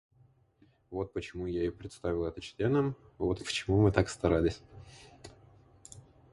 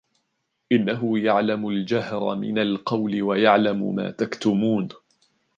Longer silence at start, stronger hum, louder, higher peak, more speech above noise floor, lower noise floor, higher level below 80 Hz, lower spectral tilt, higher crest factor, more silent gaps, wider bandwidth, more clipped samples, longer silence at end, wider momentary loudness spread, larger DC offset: first, 0.9 s vs 0.7 s; neither; second, -32 LUFS vs -23 LUFS; second, -10 dBFS vs -2 dBFS; second, 35 dB vs 53 dB; second, -66 dBFS vs -75 dBFS; first, -48 dBFS vs -66 dBFS; about the same, -6.5 dB/octave vs -7 dB/octave; about the same, 24 dB vs 20 dB; neither; first, 11.5 kHz vs 7.4 kHz; neither; second, 0.3 s vs 0.6 s; first, 25 LU vs 8 LU; neither